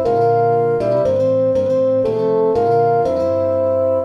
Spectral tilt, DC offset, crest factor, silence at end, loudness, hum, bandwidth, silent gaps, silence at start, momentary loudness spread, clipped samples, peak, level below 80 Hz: -8.5 dB/octave; under 0.1%; 10 dB; 0 s; -16 LUFS; none; 7 kHz; none; 0 s; 2 LU; under 0.1%; -6 dBFS; -48 dBFS